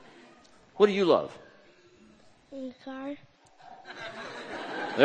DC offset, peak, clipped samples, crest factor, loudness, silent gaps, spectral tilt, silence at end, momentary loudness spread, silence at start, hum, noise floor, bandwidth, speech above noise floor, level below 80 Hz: under 0.1%; -4 dBFS; under 0.1%; 28 dB; -30 LUFS; none; -5.5 dB/octave; 0 s; 25 LU; 0.75 s; none; -58 dBFS; 9 kHz; 30 dB; -74 dBFS